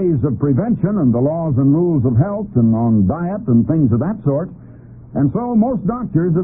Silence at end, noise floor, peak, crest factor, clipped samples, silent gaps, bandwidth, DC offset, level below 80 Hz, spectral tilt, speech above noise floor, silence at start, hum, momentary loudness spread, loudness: 0 s; -37 dBFS; -4 dBFS; 12 dB; under 0.1%; none; 2.3 kHz; under 0.1%; -42 dBFS; -17 dB/octave; 22 dB; 0 s; none; 5 LU; -16 LUFS